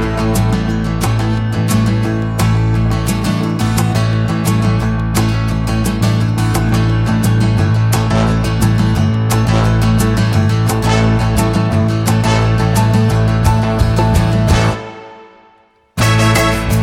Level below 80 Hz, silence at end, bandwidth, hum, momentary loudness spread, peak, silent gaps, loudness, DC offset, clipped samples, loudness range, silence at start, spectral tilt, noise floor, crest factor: -24 dBFS; 0 s; 15.5 kHz; none; 4 LU; 0 dBFS; none; -14 LUFS; under 0.1%; under 0.1%; 2 LU; 0 s; -6 dB/octave; -50 dBFS; 12 dB